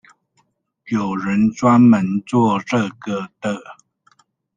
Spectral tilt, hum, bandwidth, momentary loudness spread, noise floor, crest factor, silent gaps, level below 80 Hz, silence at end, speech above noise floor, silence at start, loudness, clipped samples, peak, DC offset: -7 dB/octave; none; 9 kHz; 14 LU; -65 dBFS; 16 dB; none; -60 dBFS; 0.85 s; 48 dB; 0.85 s; -18 LUFS; under 0.1%; -2 dBFS; under 0.1%